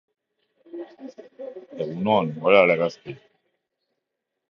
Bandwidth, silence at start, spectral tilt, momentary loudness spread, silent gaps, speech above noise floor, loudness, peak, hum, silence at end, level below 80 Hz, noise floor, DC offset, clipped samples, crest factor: 7 kHz; 0.75 s; -7 dB/octave; 24 LU; none; 60 dB; -21 LUFS; -2 dBFS; none; 1.35 s; -68 dBFS; -82 dBFS; under 0.1%; under 0.1%; 22 dB